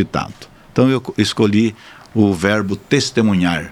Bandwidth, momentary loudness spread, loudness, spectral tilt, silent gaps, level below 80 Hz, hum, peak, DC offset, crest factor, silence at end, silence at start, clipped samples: 13.5 kHz; 8 LU; -17 LUFS; -5.5 dB/octave; none; -46 dBFS; none; 0 dBFS; under 0.1%; 16 dB; 0 s; 0 s; under 0.1%